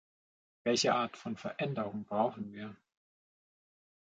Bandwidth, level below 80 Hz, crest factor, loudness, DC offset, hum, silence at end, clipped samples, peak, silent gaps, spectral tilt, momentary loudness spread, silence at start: 9 kHz; -76 dBFS; 22 dB; -34 LUFS; under 0.1%; none; 1.3 s; under 0.1%; -14 dBFS; none; -4 dB/octave; 14 LU; 0.65 s